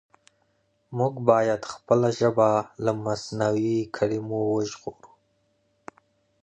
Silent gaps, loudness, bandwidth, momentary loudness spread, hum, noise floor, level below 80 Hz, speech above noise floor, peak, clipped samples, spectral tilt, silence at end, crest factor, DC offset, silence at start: none; -25 LUFS; 9.4 kHz; 10 LU; none; -69 dBFS; -62 dBFS; 45 dB; -4 dBFS; under 0.1%; -6.5 dB/octave; 1.35 s; 22 dB; under 0.1%; 0.9 s